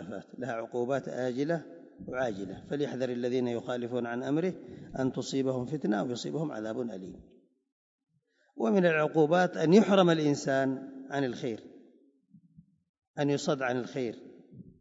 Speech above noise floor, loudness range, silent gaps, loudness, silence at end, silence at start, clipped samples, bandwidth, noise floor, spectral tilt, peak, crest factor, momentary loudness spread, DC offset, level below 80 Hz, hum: 38 dB; 9 LU; 7.72-7.98 s, 12.89-12.94 s, 13.07-13.14 s; -30 LUFS; 0.1 s; 0 s; under 0.1%; 8 kHz; -68 dBFS; -6 dB/octave; -8 dBFS; 22 dB; 14 LU; under 0.1%; -68 dBFS; none